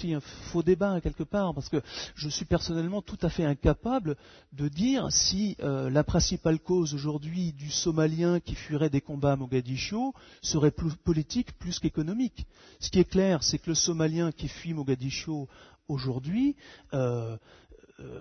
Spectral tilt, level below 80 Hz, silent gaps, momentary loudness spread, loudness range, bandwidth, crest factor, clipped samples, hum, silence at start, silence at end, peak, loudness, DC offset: -5 dB/octave; -44 dBFS; none; 10 LU; 3 LU; 6.6 kHz; 18 dB; under 0.1%; none; 0 s; 0 s; -12 dBFS; -29 LUFS; under 0.1%